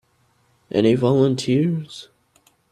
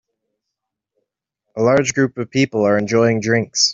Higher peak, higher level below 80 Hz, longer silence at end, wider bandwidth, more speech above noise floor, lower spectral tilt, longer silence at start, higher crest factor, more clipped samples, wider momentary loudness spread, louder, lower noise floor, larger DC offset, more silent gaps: about the same, -4 dBFS vs -2 dBFS; about the same, -58 dBFS vs -58 dBFS; first, 0.7 s vs 0 s; first, 12.5 kHz vs 7.8 kHz; second, 44 dB vs 65 dB; first, -7 dB/octave vs -4 dB/octave; second, 0.75 s vs 1.55 s; about the same, 16 dB vs 16 dB; neither; first, 16 LU vs 5 LU; about the same, -19 LUFS vs -17 LUFS; second, -62 dBFS vs -81 dBFS; neither; neither